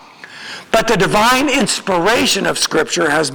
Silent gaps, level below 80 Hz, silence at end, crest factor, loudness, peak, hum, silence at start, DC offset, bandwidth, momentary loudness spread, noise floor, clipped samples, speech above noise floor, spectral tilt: none; -40 dBFS; 0 s; 14 dB; -14 LUFS; 0 dBFS; none; 0.2 s; under 0.1%; over 20 kHz; 8 LU; -34 dBFS; under 0.1%; 20 dB; -3 dB/octave